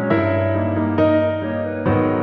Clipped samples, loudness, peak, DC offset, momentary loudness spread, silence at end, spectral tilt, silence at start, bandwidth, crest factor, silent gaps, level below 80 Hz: under 0.1%; -19 LUFS; -4 dBFS; under 0.1%; 6 LU; 0 s; -10.5 dB/octave; 0 s; 5 kHz; 14 dB; none; -48 dBFS